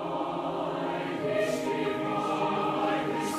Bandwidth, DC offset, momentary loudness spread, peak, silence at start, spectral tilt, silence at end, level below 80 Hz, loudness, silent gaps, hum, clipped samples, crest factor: 15.5 kHz; under 0.1%; 4 LU; -16 dBFS; 0 s; -5 dB/octave; 0 s; -64 dBFS; -30 LUFS; none; none; under 0.1%; 14 dB